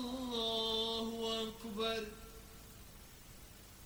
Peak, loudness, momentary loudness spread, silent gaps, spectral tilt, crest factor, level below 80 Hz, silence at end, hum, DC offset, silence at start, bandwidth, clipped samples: -24 dBFS; -38 LUFS; 20 LU; none; -3.5 dB/octave; 16 dB; -60 dBFS; 0 s; none; under 0.1%; 0 s; 19 kHz; under 0.1%